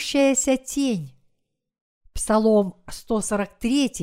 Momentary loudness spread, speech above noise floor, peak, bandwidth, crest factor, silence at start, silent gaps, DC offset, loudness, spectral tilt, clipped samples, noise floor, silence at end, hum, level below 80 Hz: 13 LU; 52 dB; -8 dBFS; 16 kHz; 16 dB; 0 s; 1.81-2.01 s; under 0.1%; -22 LUFS; -4 dB/octave; under 0.1%; -73 dBFS; 0 s; none; -44 dBFS